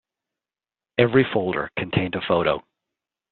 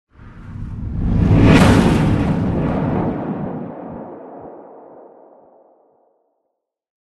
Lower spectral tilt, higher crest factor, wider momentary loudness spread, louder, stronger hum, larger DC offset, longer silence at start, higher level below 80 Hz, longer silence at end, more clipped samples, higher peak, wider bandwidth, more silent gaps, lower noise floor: second, -4.5 dB/octave vs -7.5 dB/octave; about the same, 22 dB vs 18 dB; second, 8 LU vs 24 LU; second, -22 LUFS vs -16 LUFS; neither; neither; first, 1 s vs 0.2 s; second, -54 dBFS vs -28 dBFS; second, 0.7 s vs 2.2 s; neither; about the same, -2 dBFS vs 0 dBFS; second, 4.4 kHz vs 12 kHz; neither; first, under -90 dBFS vs -75 dBFS